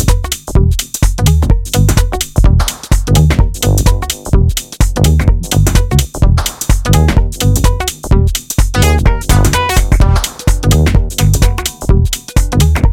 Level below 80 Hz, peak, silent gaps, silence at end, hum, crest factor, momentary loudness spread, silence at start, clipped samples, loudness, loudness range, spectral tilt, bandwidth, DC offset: -12 dBFS; 0 dBFS; none; 0 s; none; 10 dB; 5 LU; 0 s; under 0.1%; -12 LUFS; 1 LU; -5 dB/octave; 17 kHz; under 0.1%